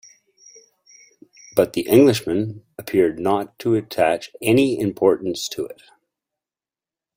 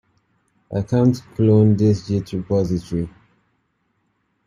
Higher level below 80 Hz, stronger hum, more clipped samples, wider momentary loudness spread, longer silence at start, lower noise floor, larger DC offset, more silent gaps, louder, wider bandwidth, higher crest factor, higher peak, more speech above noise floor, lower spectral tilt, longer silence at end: second, -58 dBFS vs -48 dBFS; neither; neither; about the same, 12 LU vs 12 LU; first, 1.55 s vs 0.7 s; first, under -90 dBFS vs -68 dBFS; neither; neither; about the same, -20 LUFS vs -19 LUFS; first, 16.5 kHz vs 10 kHz; about the same, 20 dB vs 16 dB; about the same, -2 dBFS vs -4 dBFS; first, over 71 dB vs 51 dB; second, -5.5 dB/octave vs -9 dB/octave; about the same, 1.45 s vs 1.35 s